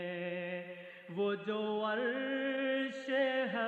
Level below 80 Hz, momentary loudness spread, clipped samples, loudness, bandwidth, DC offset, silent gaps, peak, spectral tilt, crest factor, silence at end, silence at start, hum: under -90 dBFS; 10 LU; under 0.1%; -36 LUFS; 8.2 kHz; under 0.1%; none; -22 dBFS; -6 dB/octave; 14 dB; 0 s; 0 s; none